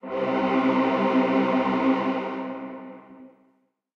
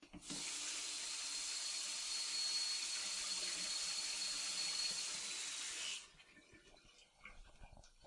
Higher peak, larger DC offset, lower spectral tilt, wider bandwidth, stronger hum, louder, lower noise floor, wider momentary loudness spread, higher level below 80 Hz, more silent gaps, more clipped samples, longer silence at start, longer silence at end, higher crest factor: first, -10 dBFS vs -30 dBFS; neither; first, -7.5 dB/octave vs 1.5 dB/octave; second, 6.6 kHz vs 11.5 kHz; neither; first, -23 LUFS vs -40 LUFS; about the same, -67 dBFS vs -66 dBFS; first, 15 LU vs 9 LU; about the same, -66 dBFS vs -70 dBFS; neither; neither; about the same, 0.05 s vs 0 s; first, 0.7 s vs 0 s; about the same, 16 dB vs 16 dB